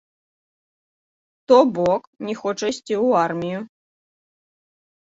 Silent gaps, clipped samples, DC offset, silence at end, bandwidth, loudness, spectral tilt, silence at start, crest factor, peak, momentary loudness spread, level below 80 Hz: 2.07-2.13 s; under 0.1%; under 0.1%; 1.5 s; 7.8 kHz; -20 LUFS; -5.5 dB/octave; 1.5 s; 20 dB; -2 dBFS; 14 LU; -64 dBFS